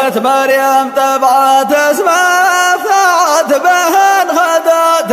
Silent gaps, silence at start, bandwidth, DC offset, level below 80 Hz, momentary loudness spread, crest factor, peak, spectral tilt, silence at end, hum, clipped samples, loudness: none; 0 s; 15.5 kHz; under 0.1%; -64 dBFS; 2 LU; 10 dB; 0 dBFS; -1.5 dB/octave; 0 s; none; under 0.1%; -9 LUFS